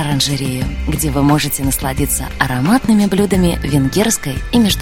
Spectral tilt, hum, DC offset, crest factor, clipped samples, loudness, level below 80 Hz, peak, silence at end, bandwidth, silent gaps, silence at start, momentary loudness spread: -4.5 dB/octave; none; under 0.1%; 14 dB; under 0.1%; -15 LUFS; -26 dBFS; 0 dBFS; 0 s; 16.5 kHz; none; 0 s; 5 LU